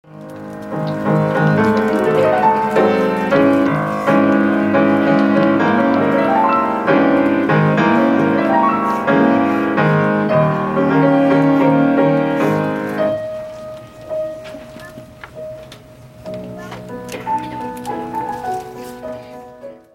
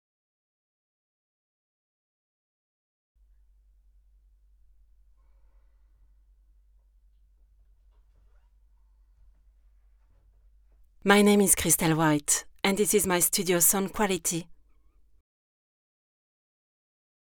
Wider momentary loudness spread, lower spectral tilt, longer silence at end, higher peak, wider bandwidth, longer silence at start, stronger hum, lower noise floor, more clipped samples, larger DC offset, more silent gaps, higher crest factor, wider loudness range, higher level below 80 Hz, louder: first, 19 LU vs 8 LU; first, -8 dB/octave vs -3.5 dB/octave; second, 0.2 s vs 2.8 s; first, -2 dBFS vs -6 dBFS; second, 14.5 kHz vs over 20 kHz; second, 0.1 s vs 11.05 s; neither; second, -39 dBFS vs -61 dBFS; neither; neither; neither; second, 14 dB vs 26 dB; about the same, 14 LU vs 12 LU; first, -50 dBFS vs -56 dBFS; first, -15 LUFS vs -23 LUFS